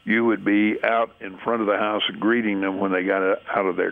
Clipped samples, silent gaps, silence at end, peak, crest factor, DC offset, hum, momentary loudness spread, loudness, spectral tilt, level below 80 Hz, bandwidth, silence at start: under 0.1%; none; 0 s; -6 dBFS; 16 dB; under 0.1%; none; 4 LU; -22 LUFS; -8 dB/octave; -66 dBFS; 3.9 kHz; 0.05 s